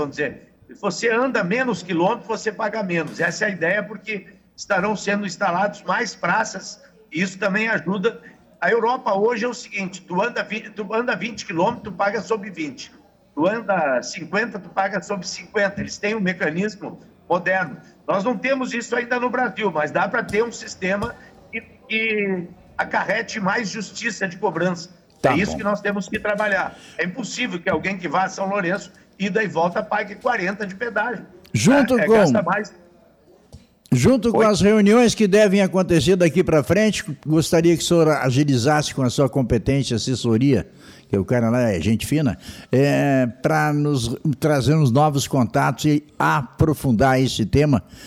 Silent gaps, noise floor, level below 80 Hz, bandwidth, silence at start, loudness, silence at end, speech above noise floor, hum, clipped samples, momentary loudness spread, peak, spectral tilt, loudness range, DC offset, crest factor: none; -53 dBFS; -46 dBFS; 16 kHz; 0 s; -21 LUFS; 0 s; 33 dB; none; under 0.1%; 11 LU; -8 dBFS; -5.5 dB/octave; 7 LU; under 0.1%; 14 dB